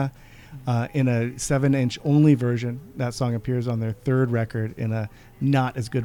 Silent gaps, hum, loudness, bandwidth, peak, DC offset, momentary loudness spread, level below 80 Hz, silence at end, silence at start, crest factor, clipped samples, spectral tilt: none; none; -24 LUFS; 18 kHz; -6 dBFS; under 0.1%; 11 LU; -50 dBFS; 0 s; 0 s; 18 dB; under 0.1%; -7 dB/octave